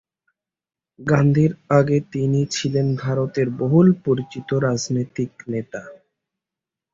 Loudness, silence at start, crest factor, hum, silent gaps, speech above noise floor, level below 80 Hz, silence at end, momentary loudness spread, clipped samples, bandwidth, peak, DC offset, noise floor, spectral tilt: -20 LUFS; 1 s; 18 dB; none; none; 68 dB; -54 dBFS; 1 s; 12 LU; under 0.1%; 7.6 kHz; -4 dBFS; under 0.1%; -87 dBFS; -7 dB/octave